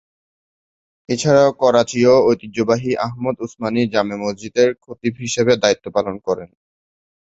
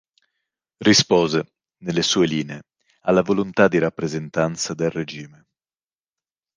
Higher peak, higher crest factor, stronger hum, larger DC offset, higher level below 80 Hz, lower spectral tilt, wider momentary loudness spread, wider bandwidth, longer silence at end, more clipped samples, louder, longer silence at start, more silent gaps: about the same, -2 dBFS vs -4 dBFS; about the same, 16 dB vs 20 dB; neither; neither; about the same, -54 dBFS vs -56 dBFS; about the same, -5 dB/octave vs -4 dB/octave; second, 11 LU vs 16 LU; second, 8.2 kHz vs 10.5 kHz; second, 0.75 s vs 1.3 s; neither; about the same, -18 LUFS vs -20 LUFS; first, 1.1 s vs 0.8 s; neither